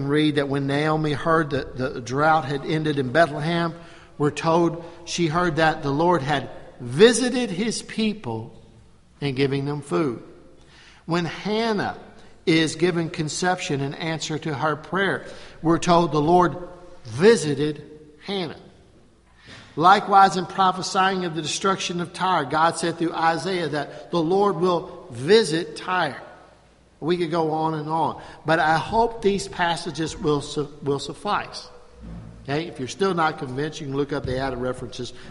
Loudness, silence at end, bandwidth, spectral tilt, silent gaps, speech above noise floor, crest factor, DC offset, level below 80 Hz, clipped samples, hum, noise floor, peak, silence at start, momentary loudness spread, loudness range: -22 LUFS; 0 s; 11.5 kHz; -5 dB/octave; none; 32 dB; 22 dB; under 0.1%; -50 dBFS; under 0.1%; none; -54 dBFS; -2 dBFS; 0 s; 13 LU; 6 LU